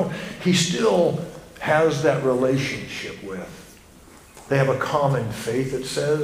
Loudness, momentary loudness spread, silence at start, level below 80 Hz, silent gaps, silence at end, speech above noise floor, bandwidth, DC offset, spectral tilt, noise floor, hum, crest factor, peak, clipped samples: -22 LUFS; 13 LU; 0 s; -52 dBFS; none; 0 s; 26 dB; 15.5 kHz; under 0.1%; -5 dB/octave; -47 dBFS; none; 18 dB; -6 dBFS; under 0.1%